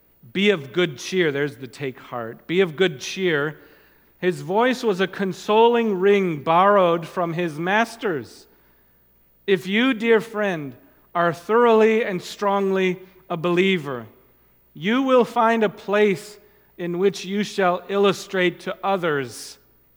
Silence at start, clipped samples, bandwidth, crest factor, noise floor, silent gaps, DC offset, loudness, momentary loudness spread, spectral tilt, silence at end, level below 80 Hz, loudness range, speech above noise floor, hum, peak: 0.35 s; under 0.1%; 16.5 kHz; 18 dB; -58 dBFS; none; under 0.1%; -21 LUFS; 14 LU; -5.5 dB/octave; 0.45 s; -66 dBFS; 5 LU; 37 dB; none; -4 dBFS